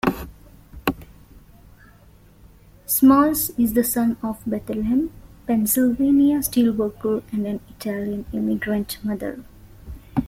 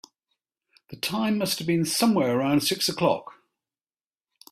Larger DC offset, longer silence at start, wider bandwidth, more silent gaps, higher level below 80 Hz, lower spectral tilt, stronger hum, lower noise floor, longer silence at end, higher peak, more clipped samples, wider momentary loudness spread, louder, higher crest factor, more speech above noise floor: neither; second, 0.05 s vs 0.9 s; about the same, 16.5 kHz vs 16 kHz; neither; first, -46 dBFS vs -66 dBFS; about the same, -5 dB/octave vs -4 dB/octave; neither; second, -50 dBFS vs under -90 dBFS; second, 0 s vs 1.3 s; first, -4 dBFS vs -8 dBFS; neither; first, 16 LU vs 7 LU; first, -21 LUFS vs -24 LUFS; about the same, 18 dB vs 20 dB; second, 30 dB vs over 66 dB